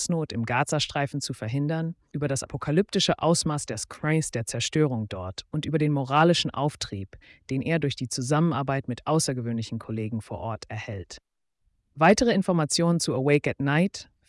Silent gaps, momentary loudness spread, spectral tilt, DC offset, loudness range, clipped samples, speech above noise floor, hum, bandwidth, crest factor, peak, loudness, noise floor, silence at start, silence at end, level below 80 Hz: none; 12 LU; -5 dB/octave; under 0.1%; 4 LU; under 0.1%; 47 dB; none; 12 kHz; 18 dB; -8 dBFS; -26 LUFS; -72 dBFS; 0 s; 0.25 s; -56 dBFS